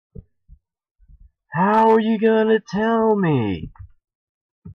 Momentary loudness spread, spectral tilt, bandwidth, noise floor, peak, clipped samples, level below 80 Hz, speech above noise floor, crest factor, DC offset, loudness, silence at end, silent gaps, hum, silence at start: 13 LU; -8 dB/octave; 6.6 kHz; -52 dBFS; -6 dBFS; under 0.1%; -50 dBFS; 34 dB; 14 dB; under 0.1%; -18 LUFS; 0 s; 0.91-0.95 s, 4.15-4.62 s; none; 0.2 s